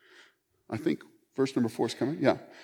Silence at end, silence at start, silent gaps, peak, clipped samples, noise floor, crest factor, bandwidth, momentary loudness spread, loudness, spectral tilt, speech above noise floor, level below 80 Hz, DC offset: 0 s; 0.7 s; none; -8 dBFS; under 0.1%; -62 dBFS; 22 dB; 17.5 kHz; 10 LU; -30 LUFS; -6 dB/octave; 33 dB; -74 dBFS; under 0.1%